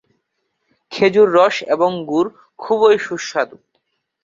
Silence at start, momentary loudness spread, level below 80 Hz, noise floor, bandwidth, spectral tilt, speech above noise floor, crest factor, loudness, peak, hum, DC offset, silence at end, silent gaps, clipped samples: 0.9 s; 12 LU; -62 dBFS; -71 dBFS; 7.6 kHz; -5 dB/octave; 56 dB; 16 dB; -16 LUFS; -2 dBFS; none; under 0.1%; 0.75 s; none; under 0.1%